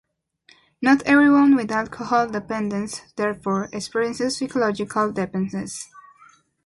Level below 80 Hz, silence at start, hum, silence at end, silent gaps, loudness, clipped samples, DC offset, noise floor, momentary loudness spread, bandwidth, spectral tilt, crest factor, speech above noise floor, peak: -58 dBFS; 0.8 s; none; 0.65 s; none; -21 LUFS; under 0.1%; under 0.1%; -57 dBFS; 13 LU; 11.5 kHz; -5 dB/octave; 16 dB; 37 dB; -6 dBFS